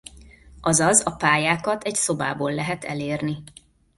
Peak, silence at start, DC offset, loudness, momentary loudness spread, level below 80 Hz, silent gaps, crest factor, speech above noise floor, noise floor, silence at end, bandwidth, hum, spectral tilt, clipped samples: -2 dBFS; 0.15 s; under 0.1%; -22 LUFS; 11 LU; -52 dBFS; none; 20 dB; 25 dB; -47 dBFS; 0.5 s; 12 kHz; none; -3.5 dB/octave; under 0.1%